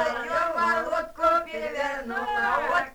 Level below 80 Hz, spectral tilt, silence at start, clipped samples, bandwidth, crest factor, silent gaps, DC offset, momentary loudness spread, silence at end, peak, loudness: -54 dBFS; -3.5 dB/octave; 0 s; under 0.1%; over 20 kHz; 16 dB; none; under 0.1%; 6 LU; 0 s; -10 dBFS; -25 LUFS